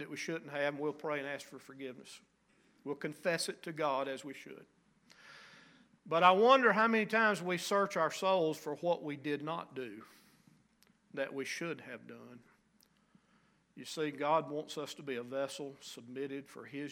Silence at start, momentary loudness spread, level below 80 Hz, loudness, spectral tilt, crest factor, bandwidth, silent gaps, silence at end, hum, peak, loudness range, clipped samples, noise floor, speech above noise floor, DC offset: 0 s; 22 LU; -86 dBFS; -34 LUFS; -4 dB/octave; 26 dB; 16.5 kHz; none; 0 s; none; -10 dBFS; 15 LU; under 0.1%; -71 dBFS; 36 dB; under 0.1%